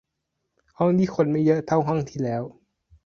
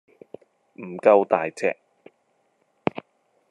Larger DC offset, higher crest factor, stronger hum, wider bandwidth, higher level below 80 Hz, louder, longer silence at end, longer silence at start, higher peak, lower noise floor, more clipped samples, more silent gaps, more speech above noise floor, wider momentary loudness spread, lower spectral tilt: neither; second, 18 dB vs 24 dB; neither; second, 7 kHz vs 10 kHz; first, -58 dBFS vs -76 dBFS; about the same, -23 LUFS vs -22 LUFS; about the same, 0.55 s vs 0.5 s; about the same, 0.8 s vs 0.8 s; second, -6 dBFS vs -2 dBFS; first, -79 dBFS vs -68 dBFS; neither; neither; first, 57 dB vs 48 dB; second, 8 LU vs 22 LU; first, -8.5 dB/octave vs -6.5 dB/octave